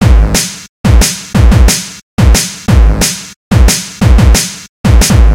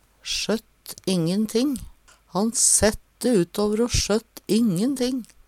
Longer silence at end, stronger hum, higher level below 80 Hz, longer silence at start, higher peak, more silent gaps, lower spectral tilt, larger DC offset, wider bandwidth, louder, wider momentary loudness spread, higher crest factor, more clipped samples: second, 0 s vs 0.2 s; neither; first, -10 dBFS vs -40 dBFS; second, 0 s vs 0.25 s; first, 0 dBFS vs -6 dBFS; first, 0.69-0.84 s, 2.03-2.17 s, 3.36-3.51 s, 4.69-4.84 s vs none; about the same, -4.5 dB/octave vs -3.5 dB/octave; neither; about the same, 17 kHz vs 16.5 kHz; first, -9 LUFS vs -22 LUFS; second, 8 LU vs 11 LU; second, 8 dB vs 18 dB; first, 5% vs under 0.1%